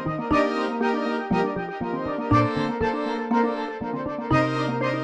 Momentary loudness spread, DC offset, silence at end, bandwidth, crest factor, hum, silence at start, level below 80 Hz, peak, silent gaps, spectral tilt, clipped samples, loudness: 8 LU; under 0.1%; 0 s; 9.4 kHz; 16 dB; none; 0 s; -48 dBFS; -8 dBFS; none; -7.5 dB/octave; under 0.1%; -24 LUFS